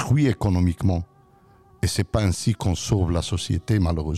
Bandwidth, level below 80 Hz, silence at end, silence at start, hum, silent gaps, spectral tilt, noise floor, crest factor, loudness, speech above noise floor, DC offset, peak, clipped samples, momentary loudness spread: 14 kHz; -36 dBFS; 0 s; 0 s; none; none; -6 dB/octave; -54 dBFS; 14 dB; -23 LUFS; 32 dB; under 0.1%; -8 dBFS; under 0.1%; 5 LU